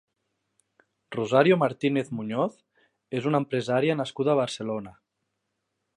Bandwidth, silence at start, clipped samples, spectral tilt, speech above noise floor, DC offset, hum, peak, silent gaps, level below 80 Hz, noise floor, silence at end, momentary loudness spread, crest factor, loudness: 11 kHz; 1.1 s; under 0.1%; -6.5 dB/octave; 55 dB; under 0.1%; none; -6 dBFS; none; -72 dBFS; -80 dBFS; 1.05 s; 12 LU; 22 dB; -26 LUFS